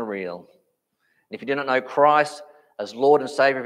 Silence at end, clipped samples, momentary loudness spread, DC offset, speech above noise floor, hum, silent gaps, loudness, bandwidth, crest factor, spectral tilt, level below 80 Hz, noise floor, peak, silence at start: 0 s; under 0.1%; 20 LU; under 0.1%; 50 dB; none; none; -21 LUFS; 11.5 kHz; 18 dB; -4.5 dB/octave; -80 dBFS; -71 dBFS; -4 dBFS; 0 s